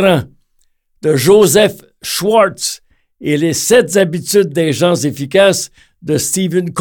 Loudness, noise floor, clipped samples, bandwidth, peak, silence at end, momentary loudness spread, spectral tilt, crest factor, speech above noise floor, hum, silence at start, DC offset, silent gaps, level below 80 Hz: -13 LUFS; -58 dBFS; under 0.1%; 19 kHz; 0 dBFS; 0 s; 11 LU; -4 dB/octave; 12 dB; 46 dB; none; 0 s; under 0.1%; none; -50 dBFS